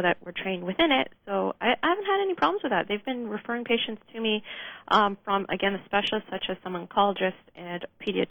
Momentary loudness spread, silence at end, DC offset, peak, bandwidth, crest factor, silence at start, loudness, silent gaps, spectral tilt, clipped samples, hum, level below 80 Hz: 10 LU; 0.05 s; under 0.1%; -8 dBFS; over 20 kHz; 20 dB; 0 s; -27 LUFS; none; -6 dB/octave; under 0.1%; none; -60 dBFS